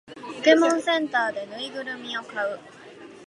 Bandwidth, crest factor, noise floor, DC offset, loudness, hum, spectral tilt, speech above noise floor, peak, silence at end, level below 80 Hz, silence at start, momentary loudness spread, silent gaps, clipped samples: 11.5 kHz; 20 dB; -45 dBFS; under 0.1%; -24 LUFS; none; -2.5 dB/octave; 21 dB; -6 dBFS; 0 s; -76 dBFS; 0.1 s; 20 LU; none; under 0.1%